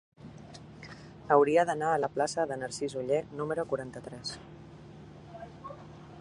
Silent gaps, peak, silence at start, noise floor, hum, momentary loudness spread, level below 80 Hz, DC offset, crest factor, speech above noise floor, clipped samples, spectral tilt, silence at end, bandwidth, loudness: none; -10 dBFS; 0.2 s; -49 dBFS; none; 24 LU; -62 dBFS; under 0.1%; 24 dB; 20 dB; under 0.1%; -5 dB/octave; 0 s; 11.5 kHz; -30 LUFS